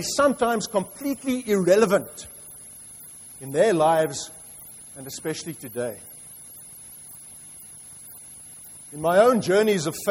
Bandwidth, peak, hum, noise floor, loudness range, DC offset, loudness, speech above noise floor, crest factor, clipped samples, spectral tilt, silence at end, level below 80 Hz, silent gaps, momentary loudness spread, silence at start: 16.5 kHz; -6 dBFS; none; -44 dBFS; 13 LU; under 0.1%; -22 LUFS; 21 dB; 18 dB; under 0.1%; -4.5 dB/octave; 0 s; -62 dBFS; none; 22 LU; 0 s